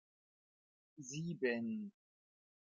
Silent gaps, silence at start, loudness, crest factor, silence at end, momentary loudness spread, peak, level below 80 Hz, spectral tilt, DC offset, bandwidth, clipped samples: none; 0.95 s; -42 LUFS; 20 dB; 0.7 s; 14 LU; -26 dBFS; -88 dBFS; -5.5 dB/octave; under 0.1%; 7.6 kHz; under 0.1%